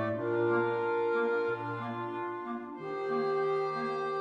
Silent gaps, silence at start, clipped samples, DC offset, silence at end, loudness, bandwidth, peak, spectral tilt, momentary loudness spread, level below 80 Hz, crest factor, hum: none; 0 s; under 0.1%; under 0.1%; 0 s; -32 LUFS; 7.2 kHz; -20 dBFS; -8 dB/octave; 8 LU; -76 dBFS; 12 dB; none